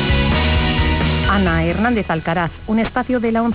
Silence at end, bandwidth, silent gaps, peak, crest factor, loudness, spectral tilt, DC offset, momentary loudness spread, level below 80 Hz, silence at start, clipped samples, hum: 0 s; 4 kHz; none; -6 dBFS; 12 dB; -17 LUFS; -10.5 dB/octave; 0.4%; 4 LU; -24 dBFS; 0 s; under 0.1%; none